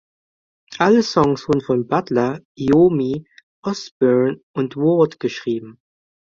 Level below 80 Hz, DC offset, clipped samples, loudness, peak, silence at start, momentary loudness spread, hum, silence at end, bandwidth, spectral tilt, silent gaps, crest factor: -54 dBFS; under 0.1%; under 0.1%; -19 LUFS; -2 dBFS; 0.7 s; 12 LU; none; 0.6 s; 7.6 kHz; -6.5 dB/octave; 2.45-2.55 s, 3.43-3.63 s, 3.91-4.00 s, 4.43-4.54 s; 18 dB